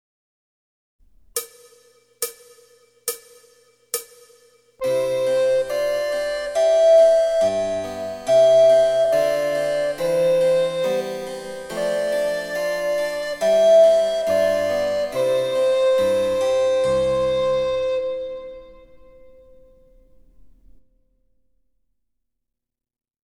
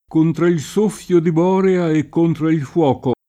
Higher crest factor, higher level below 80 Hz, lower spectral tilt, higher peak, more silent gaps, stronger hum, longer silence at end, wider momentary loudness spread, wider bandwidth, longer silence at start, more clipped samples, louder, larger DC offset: about the same, 14 dB vs 12 dB; about the same, -54 dBFS vs -52 dBFS; second, -3.5 dB/octave vs -7.5 dB/octave; about the same, -6 dBFS vs -4 dBFS; neither; neither; first, 4.7 s vs 0.15 s; first, 16 LU vs 3 LU; first, 18.5 kHz vs 13.5 kHz; first, 1.35 s vs 0.1 s; neither; second, -20 LUFS vs -17 LUFS; neither